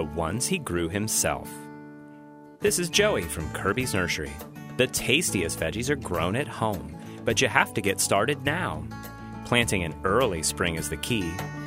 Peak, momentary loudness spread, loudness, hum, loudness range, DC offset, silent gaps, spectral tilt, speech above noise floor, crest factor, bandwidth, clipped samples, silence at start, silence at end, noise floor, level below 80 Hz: -2 dBFS; 16 LU; -26 LUFS; none; 2 LU; under 0.1%; none; -3.5 dB/octave; 21 dB; 24 dB; 16 kHz; under 0.1%; 0 s; 0 s; -47 dBFS; -46 dBFS